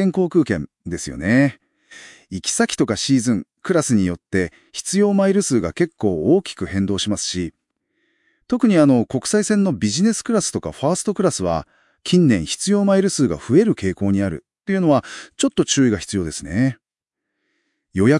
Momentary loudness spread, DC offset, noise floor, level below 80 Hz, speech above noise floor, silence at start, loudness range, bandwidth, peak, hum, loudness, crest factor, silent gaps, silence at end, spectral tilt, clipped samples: 9 LU; under 0.1%; -84 dBFS; -50 dBFS; 65 dB; 0 s; 3 LU; 12 kHz; -2 dBFS; none; -19 LUFS; 18 dB; none; 0 s; -5 dB/octave; under 0.1%